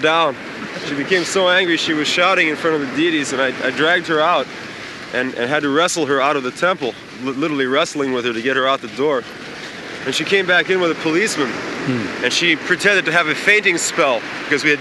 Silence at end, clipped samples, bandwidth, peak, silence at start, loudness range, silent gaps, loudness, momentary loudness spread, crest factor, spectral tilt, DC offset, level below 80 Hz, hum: 0 s; under 0.1%; 12 kHz; -2 dBFS; 0 s; 3 LU; none; -17 LUFS; 12 LU; 16 dB; -3 dB/octave; under 0.1%; -60 dBFS; none